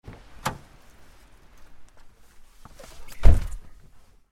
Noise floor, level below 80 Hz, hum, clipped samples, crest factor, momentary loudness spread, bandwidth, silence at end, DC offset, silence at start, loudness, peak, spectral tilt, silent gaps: -50 dBFS; -28 dBFS; none; under 0.1%; 24 dB; 24 LU; 12.5 kHz; 0.7 s; under 0.1%; 0.45 s; -27 LUFS; 0 dBFS; -6 dB/octave; none